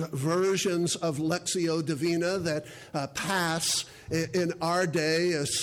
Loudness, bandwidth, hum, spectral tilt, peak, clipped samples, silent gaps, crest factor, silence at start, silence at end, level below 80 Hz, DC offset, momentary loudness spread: -28 LUFS; 19 kHz; none; -4 dB/octave; -16 dBFS; under 0.1%; none; 12 dB; 0 s; 0 s; -62 dBFS; under 0.1%; 6 LU